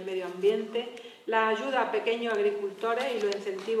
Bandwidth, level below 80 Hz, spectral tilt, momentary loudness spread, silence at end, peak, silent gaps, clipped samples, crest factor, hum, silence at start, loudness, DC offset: 13 kHz; -88 dBFS; -4 dB/octave; 8 LU; 0 s; -12 dBFS; none; under 0.1%; 16 dB; none; 0 s; -29 LUFS; under 0.1%